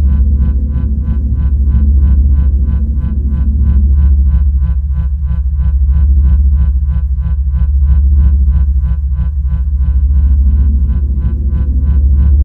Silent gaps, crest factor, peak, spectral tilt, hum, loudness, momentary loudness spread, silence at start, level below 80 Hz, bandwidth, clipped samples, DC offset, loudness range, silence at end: none; 10 dB; 0 dBFS; -12 dB/octave; none; -13 LUFS; 5 LU; 0 s; -10 dBFS; 1.6 kHz; under 0.1%; under 0.1%; 1 LU; 0 s